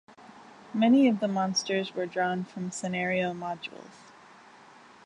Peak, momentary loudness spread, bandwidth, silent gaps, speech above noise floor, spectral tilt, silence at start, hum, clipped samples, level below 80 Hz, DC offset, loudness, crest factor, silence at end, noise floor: -12 dBFS; 14 LU; 11 kHz; none; 26 dB; -5 dB/octave; 0.2 s; none; under 0.1%; -74 dBFS; under 0.1%; -28 LUFS; 18 dB; 1.2 s; -53 dBFS